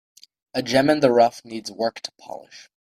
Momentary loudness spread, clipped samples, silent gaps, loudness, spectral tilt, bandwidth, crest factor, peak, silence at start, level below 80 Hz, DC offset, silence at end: 21 LU; under 0.1%; none; -20 LUFS; -5 dB/octave; 15 kHz; 20 dB; -4 dBFS; 0.55 s; -62 dBFS; under 0.1%; 0.25 s